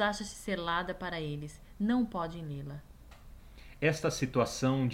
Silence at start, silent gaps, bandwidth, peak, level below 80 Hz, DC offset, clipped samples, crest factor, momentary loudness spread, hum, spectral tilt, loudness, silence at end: 0 s; none; 16 kHz; -16 dBFS; -52 dBFS; under 0.1%; under 0.1%; 18 dB; 12 LU; none; -5.5 dB/octave; -33 LUFS; 0 s